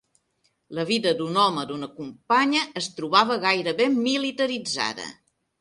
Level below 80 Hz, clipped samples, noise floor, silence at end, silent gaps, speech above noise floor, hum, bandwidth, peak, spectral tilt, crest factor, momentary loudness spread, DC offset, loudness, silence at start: -70 dBFS; under 0.1%; -70 dBFS; 0.5 s; none; 47 dB; none; 11.5 kHz; -2 dBFS; -3.5 dB/octave; 22 dB; 14 LU; under 0.1%; -23 LUFS; 0.7 s